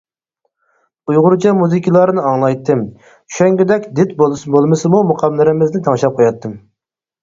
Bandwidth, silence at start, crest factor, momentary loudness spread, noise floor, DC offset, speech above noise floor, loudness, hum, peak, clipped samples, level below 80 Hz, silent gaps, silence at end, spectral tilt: 7.6 kHz; 1.1 s; 14 dB; 6 LU; -81 dBFS; under 0.1%; 68 dB; -13 LUFS; none; 0 dBFS; under 0.1%; -56 dBFS; none; 0.65 s; -7.5 dB/octave